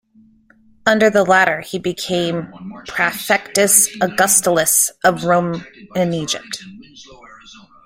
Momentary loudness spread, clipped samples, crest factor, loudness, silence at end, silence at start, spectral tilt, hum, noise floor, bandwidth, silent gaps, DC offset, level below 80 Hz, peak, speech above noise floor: 15 LU; under 0.1%; 18 dB; -16 LUFS; 0.5 s; 0.85 s; -2.5 dB/octave; none; -52 dBFS; 16.5 kHz; none; under 0.1%; -56 dBFS; 0 dBFS; 35 dB